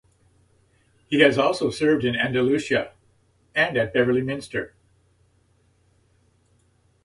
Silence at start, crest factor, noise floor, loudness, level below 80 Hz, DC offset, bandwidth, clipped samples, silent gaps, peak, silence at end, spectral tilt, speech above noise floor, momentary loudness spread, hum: 1.1 s; 22 dB; -63 dBFS; -22 LUFS; -58 dBFS; under 0.1%; 11.5 kHz; under 0.1%; none; -2 dBFS; 2.4 s; -5.5 dB/octave; 41 dB; 12 LU; none